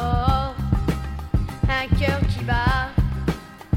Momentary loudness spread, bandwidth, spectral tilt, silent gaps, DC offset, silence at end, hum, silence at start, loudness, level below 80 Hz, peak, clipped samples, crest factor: 6 LU; 16 kHz; -7 dB/octave; none; under 0.1%; 0 s; none; 0 s; -23 LUFS; -26 dBFS; -6 dBFS; under 0.1%; 16 dB